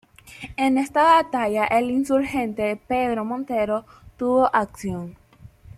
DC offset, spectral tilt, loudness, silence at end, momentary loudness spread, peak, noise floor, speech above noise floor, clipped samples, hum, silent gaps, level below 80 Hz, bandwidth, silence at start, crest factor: under 0.1%; -5.5 dB/octave; -22 LUFS; 0.05 s; 13 LU; -4 dBFS; -47 dBFS; 26 dB; under 0.1%; none; none; -52 dBFS; 15 kHz; 0.25 s; 18 dB